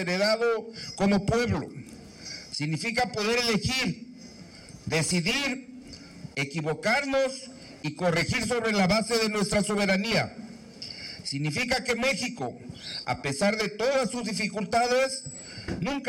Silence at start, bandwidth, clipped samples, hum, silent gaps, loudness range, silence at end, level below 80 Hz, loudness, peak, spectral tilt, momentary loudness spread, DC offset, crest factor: 0 s; 16.5 kHz; under 0.1%; none; none; 3 LU; 0 s; -52 dBFS; -27 LUFS; -14 dBFS; -4 dB/octave; 17 LU; under 0.1%; 14 dB